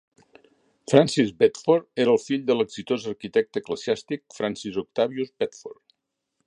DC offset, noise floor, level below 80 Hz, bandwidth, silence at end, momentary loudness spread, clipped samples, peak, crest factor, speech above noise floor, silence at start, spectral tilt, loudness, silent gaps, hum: under 0.1%; -78 dBFS; -66 dBFS; 10.5 kHz; 0.75 s; 11 LU; under 0.1%; 0 dBFS; 24 dB; 54 dB; 0.9 s; -5.5 dB/octave; -24 LUFS; none; none